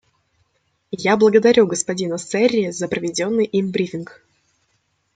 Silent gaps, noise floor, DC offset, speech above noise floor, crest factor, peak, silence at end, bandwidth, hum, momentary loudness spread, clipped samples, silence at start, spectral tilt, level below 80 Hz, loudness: none; -67 dBFS; under 0.1%; 49 dB; 18 dB; -2 dBFS; 1.1 s; 9.4 kHz; none; 12 LU; under 0.1%; 0.9 s; -4.5 dB/octave; -62 dBFS; -18 LUFS